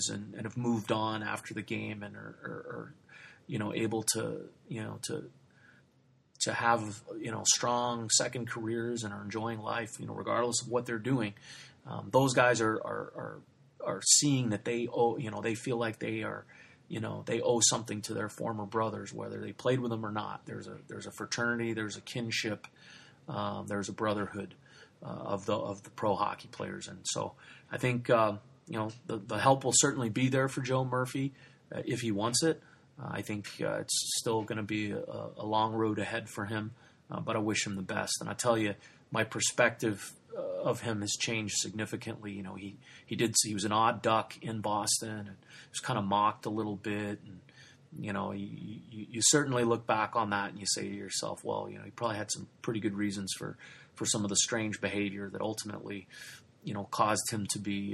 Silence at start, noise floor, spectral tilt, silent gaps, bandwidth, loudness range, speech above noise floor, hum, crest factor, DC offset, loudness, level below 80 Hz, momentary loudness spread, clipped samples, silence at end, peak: 0 s; -67 dBFS; -3.5 dB/octave; none; 13.5 kHz; 7 LU; 34 dB; none; 24 dB; under 0.1%; -32 LUFS; -72 dBFS; 16 LU; under 0.1%; 0 s; -10 dBFS